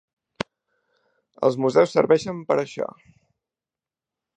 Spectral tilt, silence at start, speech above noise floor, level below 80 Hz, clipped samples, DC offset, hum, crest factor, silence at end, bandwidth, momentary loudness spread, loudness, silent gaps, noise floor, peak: -6 dB/octave; 1.4 s; over 69 dB; -66 dBFS; under 0.1%; under 0.1%; none; 22 dB; 1.5 s; 9.4 kHz; 16 LU; -22 LUFS; none; under -90 dBFS; -2 dBFS